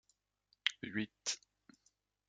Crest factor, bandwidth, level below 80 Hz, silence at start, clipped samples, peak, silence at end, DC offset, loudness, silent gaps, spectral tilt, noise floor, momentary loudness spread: 34 dB; 9.6 kHz; -82 dBFS; 0.65 s; under 0.1%; -12 dBFS; 0.9 s; under 0.1%; -40 LUFS; none; -1.5 dB/octave; -79 dBFS; 4 LU